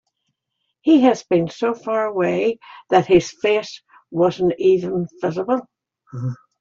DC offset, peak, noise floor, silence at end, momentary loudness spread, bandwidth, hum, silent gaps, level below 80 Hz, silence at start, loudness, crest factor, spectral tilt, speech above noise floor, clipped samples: under 0.1%; -2 dBFS; -75 dBFS; 0.25 s; 14 LU; 7.6 kHz; none; none; -56 dBFS; 0.85 s; -19 LUFS; 18 dB; -6.5 dB/octave; 57 dB; under 0.1%